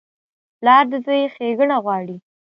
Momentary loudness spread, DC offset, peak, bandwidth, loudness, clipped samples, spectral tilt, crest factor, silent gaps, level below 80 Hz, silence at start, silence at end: 13 LU; under 0.1%; 0 dBFS; 5.6 kHz; -17 LUFS; under 0.1%; -7.5 dB/octave; 18 dB; none; -76 dBFS; 0.6 s; 0.35 s